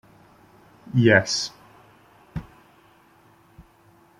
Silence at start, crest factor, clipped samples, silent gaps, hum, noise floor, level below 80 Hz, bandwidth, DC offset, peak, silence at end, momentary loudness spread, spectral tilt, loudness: 0.95 s; 24 dB; under 0.1%; none; none; -56 dBFS; -56 dBFS; 12.5 kHz; under 0.1%; -2 dBFS; 1.8 s; 21 LU; -5 dB/octave; -20 LUFS